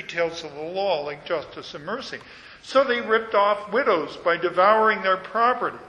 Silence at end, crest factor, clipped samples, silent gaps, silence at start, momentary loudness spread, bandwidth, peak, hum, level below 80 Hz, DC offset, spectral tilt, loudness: 0 s; 18 dB; under 0.1%; none; 0 s; 14 LU; 9.6 kHz; -4 dBFS; none; -62 dBFS; under 0.1%; -4.5 dB/octave; -22 LUFS